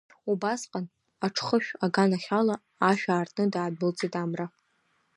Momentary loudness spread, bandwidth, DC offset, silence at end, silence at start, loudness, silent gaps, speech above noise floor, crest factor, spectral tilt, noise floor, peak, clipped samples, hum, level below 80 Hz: 10 LU; 11.5 kHz; under 0.1%; 0.7 s; 0.25 s; -28 LUFS; none; 44 dB; 20 dB; -5.5 dB/octave; -71 dBFS; -8 dBFS; under 0.1%; none; -76 dBFS